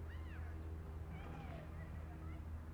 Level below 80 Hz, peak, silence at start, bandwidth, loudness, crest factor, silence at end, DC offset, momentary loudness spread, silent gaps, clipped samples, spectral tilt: -52 dBFS; -38 dBFS; 0 s; 13.5 kHz; -50 LUFS; 10 dB; 0 s; under 0.1%; 1 LU; none; under 0.1%; -8 dB/octave